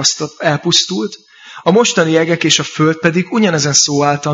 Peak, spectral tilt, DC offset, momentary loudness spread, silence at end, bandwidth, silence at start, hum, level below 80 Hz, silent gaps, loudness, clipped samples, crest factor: 0 dBFS; -3.5 dB/octave; under 0.1%; 7 LU; 0 s; 10.5 kHz; 0 s; none; -58 dBFS; none; -13 LUFS; under 0.1%; 14 dB